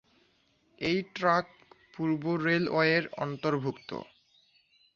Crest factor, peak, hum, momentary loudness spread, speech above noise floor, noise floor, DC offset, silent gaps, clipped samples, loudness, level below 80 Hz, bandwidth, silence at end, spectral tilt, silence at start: 20 dB; -10 dBFS; none; 16 LU; 40 dB; -69 dBFS; under 0.1%; none; under 0.1%; -29 LUFS; -68 dBFS; 7.2 kHz; 0.9 s; -6.5 dB/octave; 0.8 s